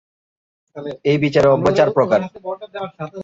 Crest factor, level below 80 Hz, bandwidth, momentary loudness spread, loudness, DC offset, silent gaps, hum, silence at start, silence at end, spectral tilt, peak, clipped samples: 16 dB; -50 dBFS; 7.8 kHz; 16 LU; -16 LUFS; under 0.1%; none; none; 0.75 s; 0 s; -7 dB/octave; -2 dBFS; under 0.1%